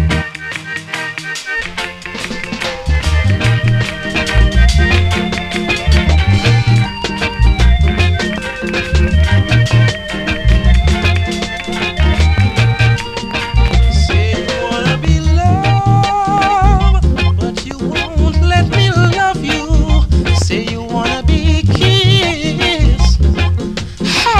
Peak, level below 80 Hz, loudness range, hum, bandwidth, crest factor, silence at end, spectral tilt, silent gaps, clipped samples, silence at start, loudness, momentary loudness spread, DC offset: 0 dBFS; -16 dBFS; 1 LU; none; 11.5 kHz; 12 dB; 0 s; -5.5 dB/octave; none; under 0.1%; 0 s; -13 LUFS; 8 LU; under 0.1%